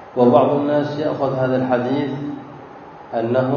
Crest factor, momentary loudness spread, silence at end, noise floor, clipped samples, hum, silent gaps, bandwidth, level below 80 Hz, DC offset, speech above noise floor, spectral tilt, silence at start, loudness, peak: 18 dB; 23 LU; 0 s; -38 dBFS; under 0.1%; none; none; 6.8 kHz; -60 dBFS; under 0.1%; 21 dB; -9 dB/octave; 0 s; -19 LUFS; 0 dBFS